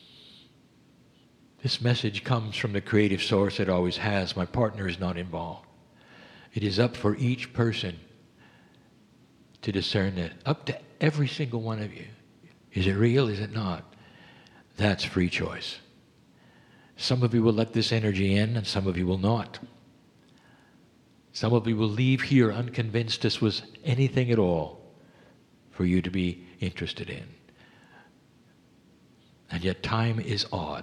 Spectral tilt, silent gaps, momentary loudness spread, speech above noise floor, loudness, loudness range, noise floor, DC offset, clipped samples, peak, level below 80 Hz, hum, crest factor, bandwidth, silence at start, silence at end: -6.5 dB/octave; none; 13 LU; 33 dB; -27 LUFS; 7 LU; -59 dBFS; under 0.1%; under 0.1%; -6 dBFS; -56 dBFS; none; 22 dB; 10.5 kHz; 1.65 s; 0 s